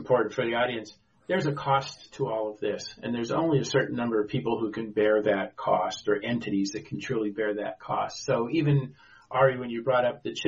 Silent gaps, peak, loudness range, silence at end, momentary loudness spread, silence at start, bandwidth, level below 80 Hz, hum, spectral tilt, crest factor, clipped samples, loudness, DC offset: none; -10 dBFS; 2 LU; 0 s; 8 LU; 0 s; 7.6 kHz; -62 dBFS; none; -5 dB/octave; 18 dB; under 0.1%; -28 LUFS; under 0.1%